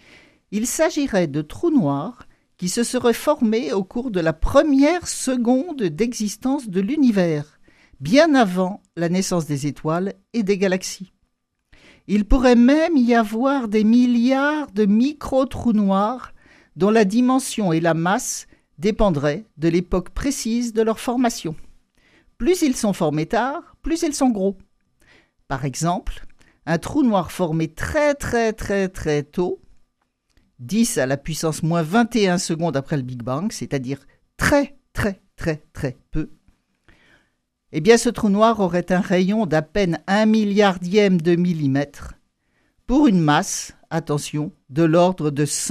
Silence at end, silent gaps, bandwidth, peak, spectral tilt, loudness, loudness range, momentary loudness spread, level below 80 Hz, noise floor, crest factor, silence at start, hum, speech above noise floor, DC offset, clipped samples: 0 s; none; 15 kHz; 0 dBFS; -5.5 dB/octave; -20 LUFS; 6 LU; 11 LU; -38 dBFS; -69 dBFS; 20 dB; 0.5 s; none; 50 dB; under 0.1%; under 0.1%